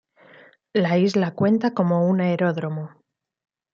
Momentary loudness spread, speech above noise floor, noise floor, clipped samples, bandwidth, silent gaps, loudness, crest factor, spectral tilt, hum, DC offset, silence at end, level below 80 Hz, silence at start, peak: 10 LU; 31 dB; -51 dBFS; under 0.1%; 7.2 kHz; none; -21 LUFS; 16 dB; -8 dB/octave; none; under 0.1%; 0.85 s; -68 dBFS; 0.75 s; -6 dBFS